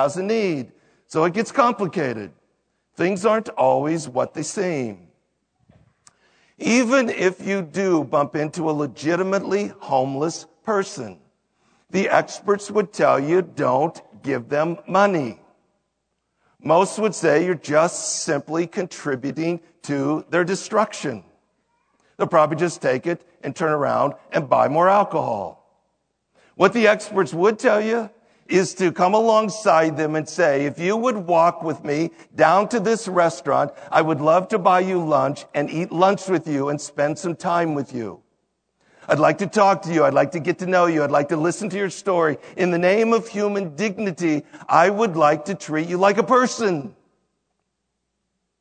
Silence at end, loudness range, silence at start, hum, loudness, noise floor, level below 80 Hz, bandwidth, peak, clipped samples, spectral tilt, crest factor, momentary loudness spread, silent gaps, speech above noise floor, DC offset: 1.7 s; 4 LU; 0 s; none; -20 LUFS; -76 dBFS; -72 dBFS; 9.4 kHz; 0 dBFS; under 0.1%; -5 dB/octave; 20 dB; 9 LU; none; 56 dB; under 0.1%